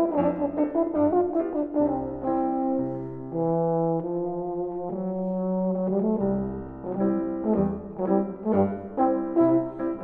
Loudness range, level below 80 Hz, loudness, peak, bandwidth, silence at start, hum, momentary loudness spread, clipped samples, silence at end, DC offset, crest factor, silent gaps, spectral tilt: 2 LU; -54 dBFS; -26 LUFS; -8 dBFS; 3 kHz; 0 s; none; 8 LU; under 0.1%; 0 s; under 0.1%; 16 dB; none; -13 dB/octave